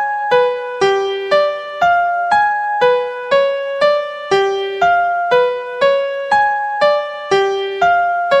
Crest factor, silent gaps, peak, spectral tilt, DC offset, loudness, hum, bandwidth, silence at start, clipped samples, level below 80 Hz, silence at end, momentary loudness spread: 14 dB; none; -2 dBFS; -3.5 dB/octave; under 0.1%; -15 LUFS; none; 9.8 kHz; 0 s; under 0.1%; -56 dBFS; 0 s; 4 LU